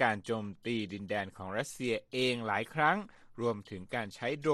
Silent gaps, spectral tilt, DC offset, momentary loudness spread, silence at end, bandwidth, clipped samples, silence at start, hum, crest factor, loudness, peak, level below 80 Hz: none; -5 dB/octave; under 0.1%; 9 LU; 0 s; 13.5 kHz; under 0.1%; 0 s; none; 20 dB; -34 LUFS; -14 dBFS; -68 dBFS